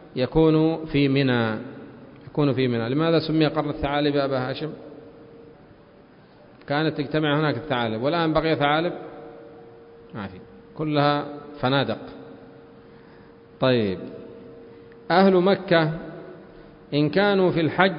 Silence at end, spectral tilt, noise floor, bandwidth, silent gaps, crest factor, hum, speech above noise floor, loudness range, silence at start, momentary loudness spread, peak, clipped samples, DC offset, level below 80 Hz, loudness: 0 s; -11 dB/octave; -51 dBFS; 5.4 kHz; none; 22 dB; none; 29 dB; 6 LU; 0 s; 22 LU; -2 dBFS; under 0.1%; under 0.1%; -50 dBFS; -22 LUFS